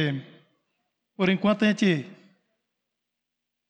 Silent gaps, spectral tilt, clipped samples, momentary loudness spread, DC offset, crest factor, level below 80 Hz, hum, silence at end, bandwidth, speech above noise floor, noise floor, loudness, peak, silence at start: none; -6.5 dB/octave; under 0.1%; 12 LU; under 0.1%; 16 dB; -70 dBFS; 60 Hz at -50 dBFS; 1.55 s; 9 kHz; 60 dB; -84 dBFS; -24 LUFS; -12 dBFS; 0 s